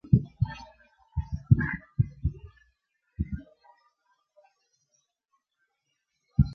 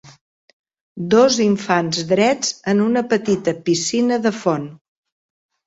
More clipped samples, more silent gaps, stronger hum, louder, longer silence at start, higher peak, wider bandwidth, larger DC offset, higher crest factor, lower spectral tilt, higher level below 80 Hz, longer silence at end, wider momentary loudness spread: neither; second, none vs 0.21-0.64 s, 0.81-0.95 s; neither; second, -30 LUFS vs -18 LUFS; about the same, 0.1 s vs 0.05 s; second, -6 dBFS vs -2 dBFS; second, 6.2 kHz vs 8 kHz; neither; first, 26 dB vs 16 dB; first, -9.5 dB/octave vs -4.5 dB/octave; first, -40 dBFS vs -60 dBFS; second, 0 s vs 0.9 s; first, 14 LU vs 7 LU